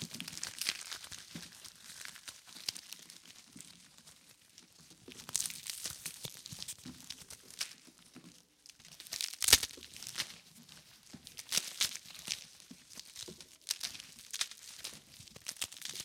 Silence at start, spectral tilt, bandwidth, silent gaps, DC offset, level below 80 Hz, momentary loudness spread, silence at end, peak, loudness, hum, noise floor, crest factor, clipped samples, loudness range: 0 s; 0.5 dB/octave; 17 kHz; none; under 0.1%; -68 dBFS; 21 LU; 0 s; -4 dBFS; -37 LUFS; none; -61 dBFS; 38 dB; under 0.1%; 13 LU